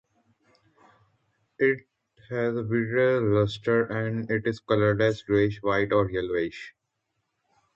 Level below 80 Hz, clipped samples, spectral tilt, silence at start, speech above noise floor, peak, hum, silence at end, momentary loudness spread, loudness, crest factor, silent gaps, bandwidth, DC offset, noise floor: -56 dBFS; under 0.1%; -7.5 dB/octave; 1.6 s; 54 dB; -8 dBFS; none; 1.05 s; 7 LU; -26 LUFS; 18 dB; none; 7.6 kHz; under 0.1%; -79 dBFS